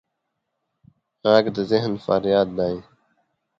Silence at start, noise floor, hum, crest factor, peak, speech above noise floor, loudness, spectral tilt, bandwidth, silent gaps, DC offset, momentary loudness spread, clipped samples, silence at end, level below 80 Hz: 1.25 s; -78 dBFS; none; 22 dB; -2 dBFS; 58 dB; -21 LUFS; -7 dB/octave; 7.4 kHz; none; under 0.1%; 8 LU; under 0.1%; 0.8 s; -56 dBFS